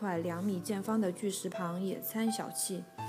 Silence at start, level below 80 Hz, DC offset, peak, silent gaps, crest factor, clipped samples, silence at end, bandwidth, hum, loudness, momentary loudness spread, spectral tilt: 0 s; -80 dBFS; under 0.1%; -20 dBFS; none; 16 dB; under 0.1%; 0 s; 15.5 kHz; none; -35 LUFS; 4 LU; -5 dB/octave